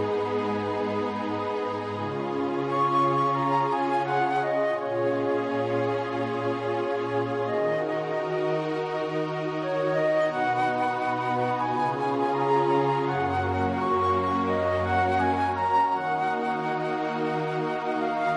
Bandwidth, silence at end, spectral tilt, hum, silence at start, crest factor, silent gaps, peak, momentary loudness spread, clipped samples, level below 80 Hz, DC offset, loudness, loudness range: 11 kHz; 0 s; -7 dB/octave; none; 0 s; 14 dB; none; -12 dBFS; 5 LU; under 0.1%; -68 dBFS; under 0.1%; -26 LUFS; 3 LU